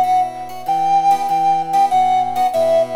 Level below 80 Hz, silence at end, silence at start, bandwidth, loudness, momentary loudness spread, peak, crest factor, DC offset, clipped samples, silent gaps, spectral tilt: -58 dBFS; 0 s; 0 s; 15.5 kHz; -16 LUFS; 6 LU; -6 dBFS; 10 dB; under 0.1%; under 0.1%; none; -4 dB/octave